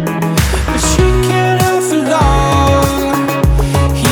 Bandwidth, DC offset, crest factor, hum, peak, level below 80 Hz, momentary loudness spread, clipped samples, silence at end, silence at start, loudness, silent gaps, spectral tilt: 19.5 kHz; under 0.1%; 10 dB; none; 0 dBFS; -18 dBFS; 3 LU; under 0.1%; 0 s; 0 s; -12 LUFS; none; -5 dB/octave